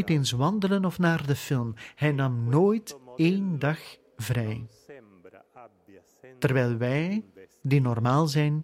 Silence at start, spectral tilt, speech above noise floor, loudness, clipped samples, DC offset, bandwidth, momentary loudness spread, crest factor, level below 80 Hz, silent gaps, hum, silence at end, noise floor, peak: 0 s; -6.5 dB/octave; 31 dB; -26 LUFS; under 0.1%; under 0.1%; 16 kHz; 12 LU; 18 dB; -60 dBFS; none; none; 0 s; -56 dBFS; -10 dBFS